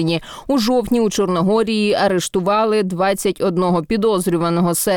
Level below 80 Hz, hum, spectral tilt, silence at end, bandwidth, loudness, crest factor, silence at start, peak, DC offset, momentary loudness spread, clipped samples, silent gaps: -46 dBFS; none; -5 dB/octave; 0 s; 19.5 kHz; -17 LUFS; 10 dB; 0 s; -6 dBFS; 0.2%; 3 LU; under 0.1%; none